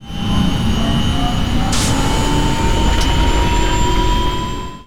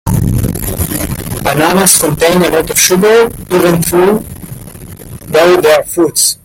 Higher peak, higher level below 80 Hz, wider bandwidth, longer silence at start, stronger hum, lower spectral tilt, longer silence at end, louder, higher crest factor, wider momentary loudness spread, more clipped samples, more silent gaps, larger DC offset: second, -6 dBFS vs 0 dBFS; first, -18 dBFS vs -30 dBFS; second, 17 kHz vs over 20 kHz; about the same, 0 s vs 0.05 s; neither; about the same, -4.5 dB/octave vs -4 dB/octave; about the same, 0 s vs 0.1 s; second, -17 LUFS vs -10 LUFS; about the same, 10 dB vs 10 dB; second, 3 LU vs 20 LU; second, under 0.1% vs 0.2%; neither; first, 6% vs under 0.1%